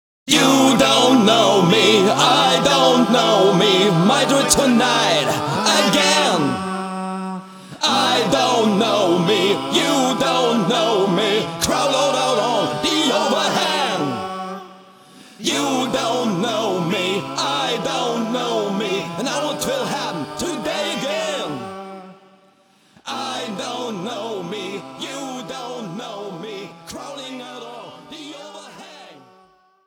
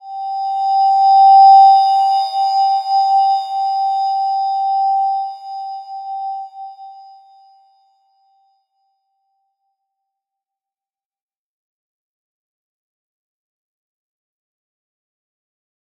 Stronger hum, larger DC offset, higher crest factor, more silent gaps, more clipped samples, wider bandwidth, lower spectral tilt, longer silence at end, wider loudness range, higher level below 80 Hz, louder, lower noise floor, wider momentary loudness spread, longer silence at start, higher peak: neither; neither; about the same, 18 dB vs 16 dB; neither; neither; first, over 20 kHz vs 7.2 kHz; first, -3.5 dB/octave vs 3.5 dB/octave; second, 0.75 s vs 9 s; second, 16 LU vs 21 LU; first, -54 dBFS vs under -90 dBFS; second, -17 LUFS vs -13 LUFS; second, -55 dBFS vs under -90 dBFS; second, 18 LU vs 21 LU; first, 0.25 s vs 0.05 s; about the same, 0 dBFS vs -2 dBFS